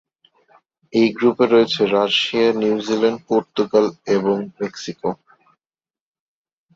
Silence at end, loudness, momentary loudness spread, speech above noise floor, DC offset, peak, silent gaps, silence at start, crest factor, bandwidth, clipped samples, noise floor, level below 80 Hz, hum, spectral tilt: 1.6 s; -18 LUFS; 12 LU; over 72 dB; under 0.1%; -2 dBFS; none; 0.95 s; 18 dB; 7.8 kHz; under 0.1%; under -90 dBFS; -64 dBFS; none; -5 dB/octave